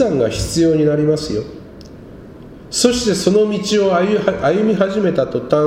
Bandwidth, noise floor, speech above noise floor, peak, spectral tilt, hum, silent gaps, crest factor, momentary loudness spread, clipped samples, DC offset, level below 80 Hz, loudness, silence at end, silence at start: 16 kHz; -36 dBFS; 21 dB; 0 dBFS; -5 dB/octave; none; none; 16 dB; 7 LU; under 0.1%; under 0.1%; -40 dBFS; -16 LUFS; 0 s; 0 s